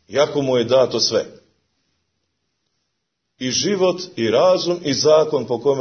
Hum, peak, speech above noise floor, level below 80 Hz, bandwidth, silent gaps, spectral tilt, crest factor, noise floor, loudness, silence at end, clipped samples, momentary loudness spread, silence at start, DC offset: none; -2 dBFS; 58 dB; -62 dBFS; 6.6 kHz; none; -4 dB/octave; 16 dB; -76 dBFS; -18 LUFS; 0 s; under 0.1%; 7 LU; 0.1 s; under 0.1%